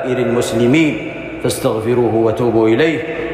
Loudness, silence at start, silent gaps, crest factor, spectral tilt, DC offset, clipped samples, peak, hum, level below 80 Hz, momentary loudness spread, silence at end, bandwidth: -15 LUFS; 0 s; none; 12 dB; -6 dB/octave; under 0.1%; under 0.1%; -4 dBFS; none; -44 dBFS; 8 LU; 0 s; 15.5 kHz